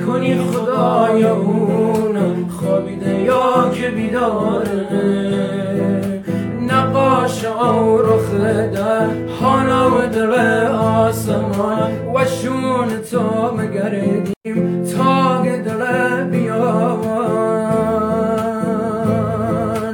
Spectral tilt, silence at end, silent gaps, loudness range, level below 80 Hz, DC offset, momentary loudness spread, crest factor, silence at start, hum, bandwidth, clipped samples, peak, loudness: -7 dB/octave; 0 s; 14.36-14.41 s; 3 LU; -46 dBFS; under 0.1%; 6 LU; 14 dB; 0 s; none; 17 kHz; under 0.1%; -2 dBFS; -17 LUFS